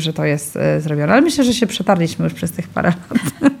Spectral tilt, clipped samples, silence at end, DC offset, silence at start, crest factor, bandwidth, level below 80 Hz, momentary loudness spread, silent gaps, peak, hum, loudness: -5.5 dB/octave; under 0.1%; 0 s; under 0.1%; 0 s; 16 dB; 17.5 kHz; -50 dBFS; 8 LU; none; 0 dBFS; none; -17 LUFS